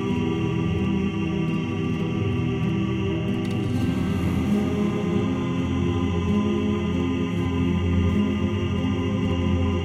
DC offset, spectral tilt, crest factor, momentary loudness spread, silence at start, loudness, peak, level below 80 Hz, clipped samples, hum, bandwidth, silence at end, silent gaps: under 0.1%; -7.5 dB/octave; 12 dB; 3 LU; 0 s; -24 LUFS; -10 dBFS; -40 dBFS; under 0.1%; none; 11.5 kHz; 0 s; none